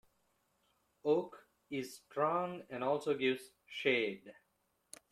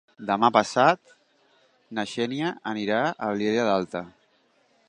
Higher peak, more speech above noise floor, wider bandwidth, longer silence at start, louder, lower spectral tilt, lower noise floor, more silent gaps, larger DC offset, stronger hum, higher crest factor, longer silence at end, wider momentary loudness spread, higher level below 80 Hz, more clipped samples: second, -16 dBFS vs -2 dBFS; about the same, 44 dB vs 41 dB; first, 14.5 kHz vs 10.5 kHz; first, 1.05 s vs 0.2 s; second, -37 LUFS vs -25 LUFS; about the same, -5 dB/octave vs -5 dB/octave; first, -80 dBFS vs -65 dBFS; neither; neither; neither; about the same, 22 dB vs 24 dB; about the same, 0.8 s vs 0.8 s; about the same, 15 LU vs 13 LU; second, -82 dBFS vs -68 dBFS; neither